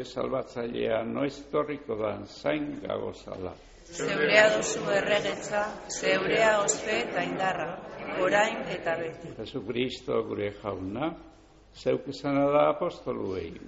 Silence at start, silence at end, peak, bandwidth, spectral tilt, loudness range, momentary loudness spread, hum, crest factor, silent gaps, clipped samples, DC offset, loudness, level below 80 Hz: 0 s; 0 s; -6 dBFS; 8 kHz; -3 dB/octave; 8 LU; 13 LU; none; 24 dB; none; under 0.1%; under 0.1%; -28 LUFS; -58 dBFS